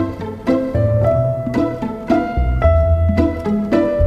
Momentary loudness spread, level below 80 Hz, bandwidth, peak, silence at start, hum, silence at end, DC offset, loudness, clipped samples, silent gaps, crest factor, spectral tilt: 6 LU; -24 dBFS; 7.2 kHz; -2 dBFS; 0 s; none; 0 s; under 0.1%; -17 LUFS; under 0.1%; none; 14 dB; -9.5 dB/octave